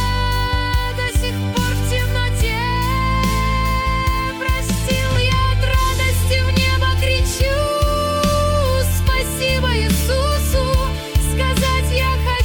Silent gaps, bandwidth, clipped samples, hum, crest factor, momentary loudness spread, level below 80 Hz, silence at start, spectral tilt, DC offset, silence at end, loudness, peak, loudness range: none; 18 kHz; under 0.1%; none; 12 dB; 3 LU; -22 dBFS; 0 s; -4.5 dB/octave; under 0.1%; 0 s; -18 LUFS; -4 dBFS; 2 LU